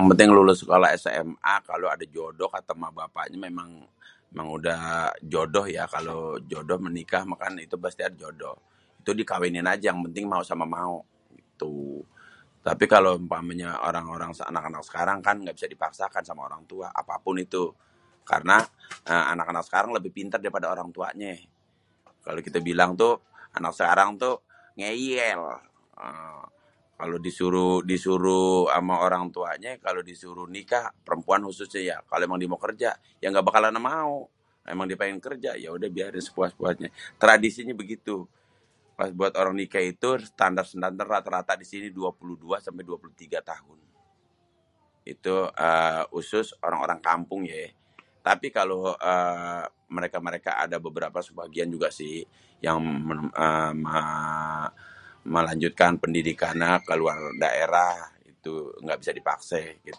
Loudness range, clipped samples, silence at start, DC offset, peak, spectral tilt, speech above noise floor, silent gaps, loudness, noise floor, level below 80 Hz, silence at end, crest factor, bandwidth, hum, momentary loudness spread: 6 LU; under 0.1%; 0 s; under 0.1%; 0 dBFS; -5 dB/octave; 42 dB; none; -26 LUFS; -67 dBFS; -60 dBFS; 0 s; 26 dB; 11.5 kHz; none; 16 LU